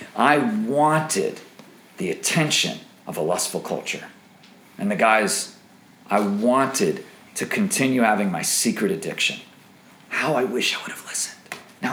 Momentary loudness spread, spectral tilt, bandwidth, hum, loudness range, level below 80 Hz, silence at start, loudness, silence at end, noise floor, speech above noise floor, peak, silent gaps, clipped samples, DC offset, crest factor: 13 LU; -3.5 dB/octave; over 20 kHz; none; 3 LU; -74 dBFS; 0 s; -22 LUFS; 0 s; -50 dBFS; 29 dB; -2 dBFS; none; under 0.1%; under 0.1%; 22 dB